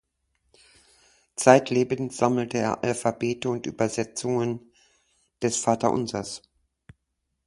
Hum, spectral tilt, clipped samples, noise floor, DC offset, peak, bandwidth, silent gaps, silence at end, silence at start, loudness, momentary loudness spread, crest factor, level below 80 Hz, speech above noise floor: none; -5 dB/octave; under 0.1%; -79 dBFS; under 0.1%; 0 dBFS; 11.5 kHz; none; 1.1 s; 1.4 s; -25 LUFS; 13 LU; 26 dB; -62 dBFS; 54 dB